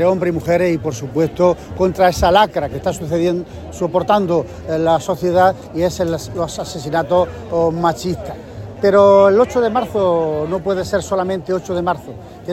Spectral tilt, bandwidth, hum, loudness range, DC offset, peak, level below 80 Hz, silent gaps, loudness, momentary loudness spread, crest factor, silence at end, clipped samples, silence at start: -6 dB/octave; 16 kHz; none; 3 LU; under 0.1%; 0 dBFS; -40 dBFS; none; -17 LUFS; 11 LU; 16 dB; 0 s; under 0.1%; 0 s